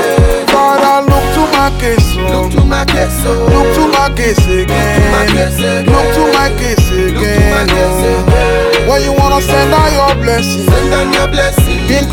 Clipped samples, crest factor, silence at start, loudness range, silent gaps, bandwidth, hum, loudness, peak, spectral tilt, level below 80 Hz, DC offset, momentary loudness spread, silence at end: under 0.1%; 10 dB; 0 s; 1 LU; none; 17.5 kHz; none; -10 LUFS; 0 dBFS; -5 dB/octave; -16 dBFS; under 0.1%; 3 LU; 0 s